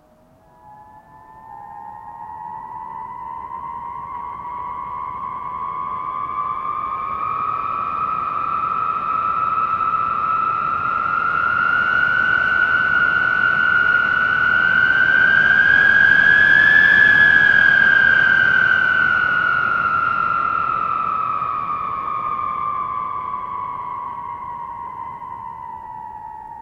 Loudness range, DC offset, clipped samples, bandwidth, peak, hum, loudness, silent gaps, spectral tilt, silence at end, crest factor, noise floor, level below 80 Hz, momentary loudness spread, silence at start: 19 LU; under 0.1%; under 0.1%; 7.4 kHz; -2 dBFS; none; -16 LUFS; none; -4 dB/octave; 0 s; 16 dB; -52 dBFS; -50 dBFS; 21 LU; 0.65 s